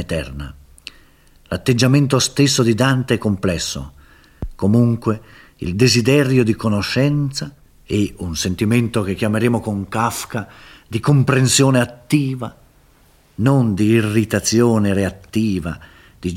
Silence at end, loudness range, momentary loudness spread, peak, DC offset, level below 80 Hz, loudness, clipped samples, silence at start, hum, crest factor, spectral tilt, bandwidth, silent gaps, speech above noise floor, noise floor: 0 s; 3 LU; 16 LU; 0 dBFS; under 0.1%; -42 dBFS; -17 LUFS; under 0.1%; 0 s; none; 18 dB; -5 dB/octave; 16 kHz; none; 35 dB; -52 dBFS